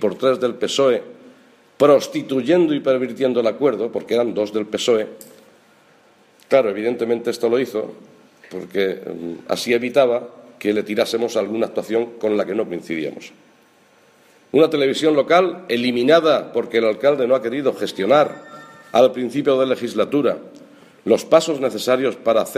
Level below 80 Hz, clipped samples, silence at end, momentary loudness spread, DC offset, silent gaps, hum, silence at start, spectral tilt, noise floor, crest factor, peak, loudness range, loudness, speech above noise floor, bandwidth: -70 dBFS; under 0.1%; 0 s; 10 LU; under 0.1%; none; none; 0 s; -5 dB/octave; -54 dBFS; 18 dB; 0 dBFS; 5 LU; -19 LUFS; 35 dB; 15.5 kHz